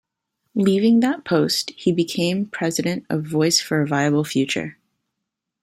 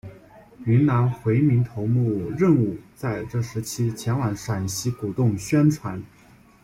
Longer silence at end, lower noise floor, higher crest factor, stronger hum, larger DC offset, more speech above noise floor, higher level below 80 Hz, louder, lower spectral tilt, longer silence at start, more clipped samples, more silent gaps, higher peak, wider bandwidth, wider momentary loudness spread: first, 0.9 s vs 0.6 s; first, -81 dBFS vs -48 dBFS; about the same, 16 dB vs 16 dB; neither; neither; first, 61 dB vs 26 dB; second, -62 dBFS vs -52 dBFS; first, -20 LUFS vs -23 LUFS; second, -4.5 dB/octave vs -7 dB/octave; first, 0.55 s vs 0.05 s; neither; neither; about the same, -4 dBFS vs -6 dBFS; about the same, 16 kHz vs 16 kHz; second, 7 LU vs 10 LU